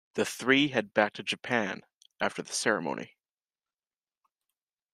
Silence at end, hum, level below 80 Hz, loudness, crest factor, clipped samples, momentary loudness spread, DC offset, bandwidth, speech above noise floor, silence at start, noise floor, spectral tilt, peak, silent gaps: 1.85 s; none; -74 dBFS; -29 LUFS; 24 dB; under 0.1%; 12 LU; under 0.1%; 15 kHz; over 61 dB; 0.15 s; under -90 dBFS; -3.5 dB/octave; -8 dBFS; none